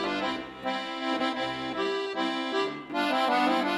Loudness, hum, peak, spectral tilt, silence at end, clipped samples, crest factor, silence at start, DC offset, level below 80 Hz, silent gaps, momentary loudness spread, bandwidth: -29 LUFS; none; -12 dBFS; -4 dB/octave; 0 s; under 0.1%; 16 dB; 0 s; under 0.1%; -66 dBFS; none; 8 LU; 15.5 kHz